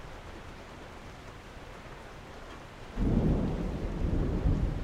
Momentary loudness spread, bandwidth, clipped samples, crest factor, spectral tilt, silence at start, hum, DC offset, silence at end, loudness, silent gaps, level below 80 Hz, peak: 17 LU; 10 kHz; under 0.1%; 18 dB; -8 dB/octave; 0 s; none; under 0.1%; 0 s; -32 LUFS; none; -36 dBFS; -14 dBFS